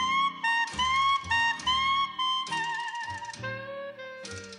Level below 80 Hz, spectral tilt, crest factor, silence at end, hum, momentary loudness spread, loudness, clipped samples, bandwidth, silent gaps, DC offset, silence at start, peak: -56 dBFS; -1.5 dB/octave; 14 dB; 0 s; none; 14 LU; -27 LUFS; under 0.1%; 11 kHz; none; under 0.1%; 0 s; -16 dBFS